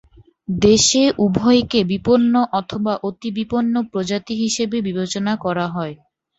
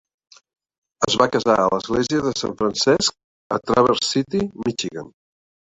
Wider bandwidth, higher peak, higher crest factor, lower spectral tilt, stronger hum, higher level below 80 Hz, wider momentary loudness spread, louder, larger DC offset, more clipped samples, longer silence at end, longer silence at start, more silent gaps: about the same, 8.2 kHz vs 8.4 kHz; about the same, -2 dBFS vs -2 dBFS; about the same, 16 dB vs 20 dB; about the same, -4.5 dB/octave vs -4 dB/octave; neither; about the same, -48 dBFS vs -52 dBFS; about the same, 11 LU vs 9 LU; about the same, -18 LUFS vs -20 LUFS; neither; neither; second, 0.45 s vs 0.7 s; second, 0.5 s vs 1 s; second, none vs 3.24-3.50 s